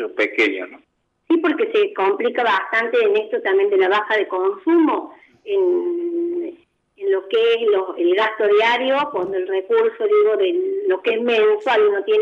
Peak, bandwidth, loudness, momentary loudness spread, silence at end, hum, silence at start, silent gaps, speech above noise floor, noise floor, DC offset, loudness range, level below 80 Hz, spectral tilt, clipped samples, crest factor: -6 dBFS; 7.2 kHz; -18 LUFS; 7 LU; 0 s; none; 0 s; none; 31 dB; -49 dBFS; under 0.1%; 3 LU; -74 dBFS; -4.5 dB/octave; under 0.1%; 12 dB